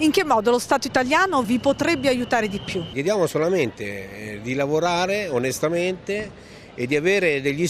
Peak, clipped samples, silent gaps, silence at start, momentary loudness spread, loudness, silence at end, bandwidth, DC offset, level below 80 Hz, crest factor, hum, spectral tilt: -4 dBFS; under 0.1%; none; 0 s; 12 LU; -22 LUFS; 0 s; 14.5 kHz; under 0.1%; -52 dBFS; 18 dB; none; -4.5 dB/octave